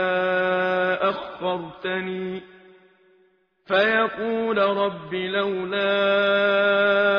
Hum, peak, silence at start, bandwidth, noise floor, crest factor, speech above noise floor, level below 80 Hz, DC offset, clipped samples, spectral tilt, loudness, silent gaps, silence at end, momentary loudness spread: none; -6 dBFS; 0 s; 6.2 kHz; -62 dBFS; 16 dB; 40 dB; -64 dBFS; under 0.1%; under 0.1%; -2 dB/octave; -22 LUFS; none; 0 s; 10 LU